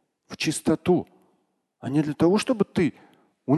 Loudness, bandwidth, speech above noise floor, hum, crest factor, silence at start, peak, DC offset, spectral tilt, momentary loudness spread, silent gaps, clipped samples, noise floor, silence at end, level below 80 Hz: -24 LUFS; 12.5 kHz; 48 dB; none; 18 dB; 0.3 s; -8 dBFS; under 0.1%; -6 dB/octave; 17 LU; none; under 0.1%; -71 dBFS; 0 s; -58 dBFS